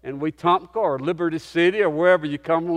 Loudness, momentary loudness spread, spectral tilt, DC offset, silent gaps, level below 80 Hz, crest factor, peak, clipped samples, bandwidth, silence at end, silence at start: -21 LUFS; 6 LU; -6.5 dB/octave; under 0.1%; none; -60 dBFS; 16 dB; -4 dBFS; under 0.1%; 10 kHz; 0 s; 0.05 s